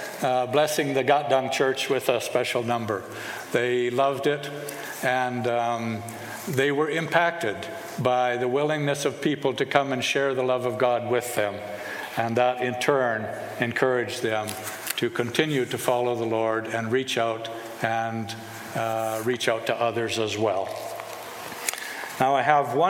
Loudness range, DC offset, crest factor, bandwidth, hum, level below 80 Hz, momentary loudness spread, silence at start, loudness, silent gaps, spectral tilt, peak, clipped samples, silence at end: 3 LU; under 0.1%; 22 dB; 17 kHz; none; -70 dBFS; 11 LU; 0 s; -25 LUFS; none; -4 dB/octave; -4 dBFS; under 0.1%; 0 s